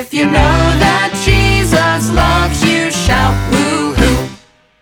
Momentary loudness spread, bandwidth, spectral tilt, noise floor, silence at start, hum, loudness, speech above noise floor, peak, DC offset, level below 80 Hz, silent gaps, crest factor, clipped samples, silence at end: 3 LU; over 20 kHz; -4.5 dB/octave; -39 dBFS; 0 s; none; -11 LUFS; 29 dB; 0 dBFS; under 0.1%; -20 dBFS; none; 12 dB; under 0.1%; 0.45 s